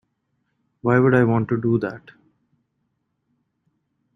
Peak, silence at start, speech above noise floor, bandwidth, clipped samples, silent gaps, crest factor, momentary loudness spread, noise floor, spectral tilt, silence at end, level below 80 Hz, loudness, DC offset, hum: -4 dBFS; 0.85 s; 55 dB; 6 kHz; under 0.1%; none; 20 dB; 13 LU; -73 dBFS; -10 dB/octave; 2.2 s; -60 dBFS; -20 LUFS; under 0.1%; none